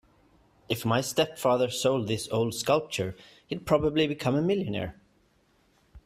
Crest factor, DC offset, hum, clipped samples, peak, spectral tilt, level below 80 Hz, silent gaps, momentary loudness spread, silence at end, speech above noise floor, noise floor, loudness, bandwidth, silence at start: 20 dB; under 0.1%; none; under 0.1%; -8 dBFS; -5 dB/octave; -56 dBFS; none; 9 LU; 0.05 s; 39 dB; -66 dBFS; -28 LUFS; 15.5 kHz; 0.7 s